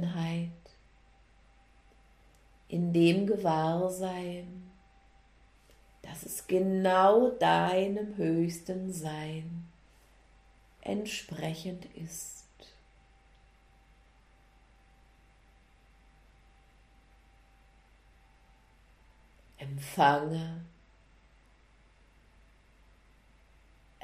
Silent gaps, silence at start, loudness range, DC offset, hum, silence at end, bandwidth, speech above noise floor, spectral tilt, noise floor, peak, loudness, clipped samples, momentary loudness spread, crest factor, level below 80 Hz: none; 0 s; 16 LU; under 0.1%; none; 3.35 s; 15.5 kHz; 32 dB; -6 dB/octave; -62 dBFS; -12 dBFS; -30 LUFS; under 0.1%; 20 LU; 22 dB; -62 dBFS